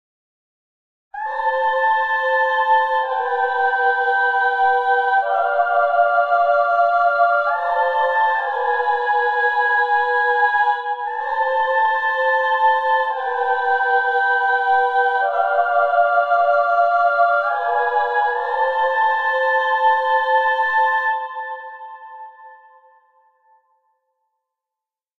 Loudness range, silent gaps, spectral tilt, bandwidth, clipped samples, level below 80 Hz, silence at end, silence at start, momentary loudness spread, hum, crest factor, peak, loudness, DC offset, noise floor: 3 LU; none; 0 dB/octave; 6.6 kHz; under 0.1%; -64 dBFS; 2.65 s; 1.15 s; 5 LU; none; 14 dB; -4 dBFS; -17 LUFS; under 0.1%; -88 dBFS